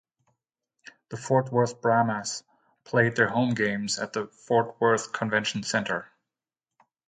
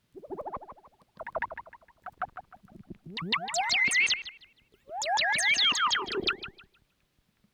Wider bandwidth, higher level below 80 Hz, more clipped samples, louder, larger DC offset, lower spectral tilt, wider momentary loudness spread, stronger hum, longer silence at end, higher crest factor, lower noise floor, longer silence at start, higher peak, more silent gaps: second, 9.6 kHz vs over 20 kHz; about the same, -68 dBFS vs -64 dBFS; neither; about the same, -26 LUFS vs -27 LUFS; neither; first, -4.5 dB/octave vs -0.5 dB/octave; second, 10 LU vs 22 LU; neither; first, 1.05 s vs 0.9 s; first, 22 dB vs 16 dB; first, under -90 dBFS vs -72 dBFS; first, 1.1 s vs 0.15 s; first, -6 dBFS vs -16 dBFS; neither